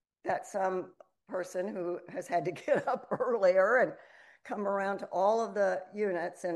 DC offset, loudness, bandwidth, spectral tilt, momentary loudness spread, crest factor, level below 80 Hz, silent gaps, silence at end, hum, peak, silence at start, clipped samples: under 0.1%; -32 LUFS; 12 kHz; -5.5 dB/octave; 12 LU; 16 dB; -82 dBFS; none; 0 s; none; -16 dBFS; 0.25 s; under 0.1%